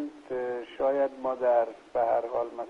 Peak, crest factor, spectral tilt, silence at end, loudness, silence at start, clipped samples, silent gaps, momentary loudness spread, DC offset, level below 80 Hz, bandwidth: -14 dBFS; 14 dB; -6 dB/octave; 0 s; -29 LUFS; 0 s; under 0.1%; none; 9 LU; under 0.1%; -66 dBFS; 7.2 kHz